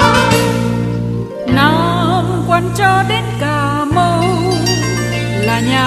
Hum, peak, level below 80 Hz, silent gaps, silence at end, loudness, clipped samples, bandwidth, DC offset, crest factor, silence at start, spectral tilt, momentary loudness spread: none; 0 dBFS; -34 dBFS; none; 0 s; -14 LUFS; under 0.1%; 14 kHz; under 0.1%; 14 dB; 0 s; -5.5 dB/octave; 6 LU